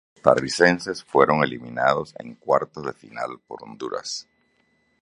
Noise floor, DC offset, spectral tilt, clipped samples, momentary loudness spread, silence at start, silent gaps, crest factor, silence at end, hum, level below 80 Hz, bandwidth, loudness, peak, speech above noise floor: -66 dBFS; under 0.1%; -4.5 dB/octave; under 0.1%; 16 LU; 0.25 s; none; 22 dB; 0.8 s; none; -60 dBFS; 11.5 kHz; -22 LUFS; 0 dBFS; 43 dB